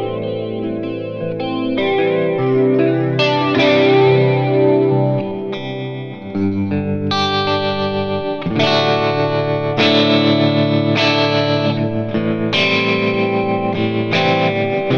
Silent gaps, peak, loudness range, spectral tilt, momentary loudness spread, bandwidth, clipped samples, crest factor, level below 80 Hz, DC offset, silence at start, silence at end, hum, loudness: none; -2 dBFS; 4 LU; -7 dB/octave; 10 LU; 7 kHz; under 0.1%; 14 dB; -50 dBFS; under 0.1%; 0 s; 0 s; none; -16 LUFS